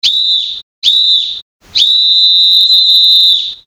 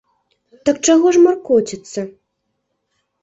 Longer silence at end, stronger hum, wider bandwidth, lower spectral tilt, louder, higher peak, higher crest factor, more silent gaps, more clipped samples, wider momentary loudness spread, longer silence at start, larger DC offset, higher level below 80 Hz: second, 0.1 s vs 1.15 s; neither; first, over 20 kHz vs 8 kHz; second, 3 dB/octave vs -4 dB/octave; first, -6 LUFS vs -15 LUFS; about the same, 0 dBFS vs -2 dBFS; second, 10 dB vs 16 dB; first, 0.63-0.82 s, 1.42-1.60 s vs none; first, 0.9% vs under 0.1%; second, 11 LU vs 16 LU; second, 0.05 s vs 0.65 s; neither; about the same, -56 dBFS vs -58 dBFS